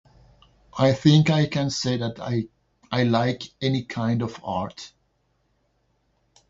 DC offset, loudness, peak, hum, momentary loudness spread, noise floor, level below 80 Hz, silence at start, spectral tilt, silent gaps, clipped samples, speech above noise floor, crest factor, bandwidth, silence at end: under 0.1%; -23 LUFS; -4 dBFS; none; 16 LU; -69 dBFS; -56 dBFS; 0.75 s; -6 dB/octave; none; under 0.1%; 47 dB; 20 dB; 7.8 kHz; 1.65 s